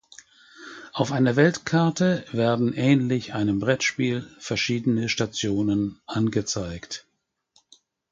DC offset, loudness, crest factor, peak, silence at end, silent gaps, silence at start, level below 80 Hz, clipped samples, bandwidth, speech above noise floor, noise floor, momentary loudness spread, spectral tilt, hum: under 0.1%; -24 LUFS; 20 dB; -4 dBFS; 1.1 s; none; 0.6 s; -54 dBFS; under 0.1%; 9.2 kHz; 43 dB; -66 dBFS; 13 LU; -5.5 dB/octave; none